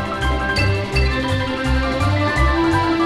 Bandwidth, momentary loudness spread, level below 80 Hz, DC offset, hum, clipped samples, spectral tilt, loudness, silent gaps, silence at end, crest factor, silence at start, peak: 12.5 kHz; 4 LU; -24 dBFS; under 0.1%; none; under 0.1%; -6 dB/octave; -18 LUFS; none; 0 s; 14 dB; 0 s; -4 dBFS